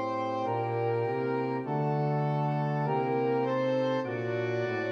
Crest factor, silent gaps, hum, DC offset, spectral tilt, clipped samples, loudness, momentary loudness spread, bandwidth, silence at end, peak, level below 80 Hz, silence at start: 10 dB; none; none; under 0.1%; -8.5 dB/octave; under 0.1%; -30 LUFS; 3 LU; 6.6 kHz; 0 s; -18 dBFS; -82 dBFS; 0 s